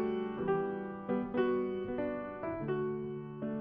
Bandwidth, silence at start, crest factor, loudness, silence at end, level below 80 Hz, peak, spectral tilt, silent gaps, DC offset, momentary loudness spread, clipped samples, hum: 3.6 kHz; 0 s; 16 dB; -36 LUFS; 0 s; -62 dBFS; -20 dBFS; -6.5 dB/octave; none; under 0.1%; 7 LU; under 0.1%; none